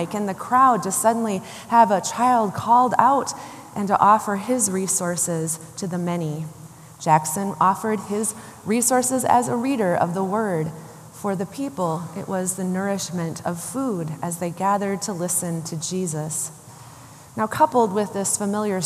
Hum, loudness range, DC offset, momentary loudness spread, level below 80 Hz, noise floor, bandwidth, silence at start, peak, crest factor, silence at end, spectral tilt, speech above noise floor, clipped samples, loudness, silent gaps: none; 7 LU; under 0.1%; 12 LU; -66 dBFS; -44 dBFS; 15 kHz; 0 s; 0 dBFS; 22 dB; 0 s; -4.5 dB/octave; 22 dB; under 0.1%; -22 LUFS; none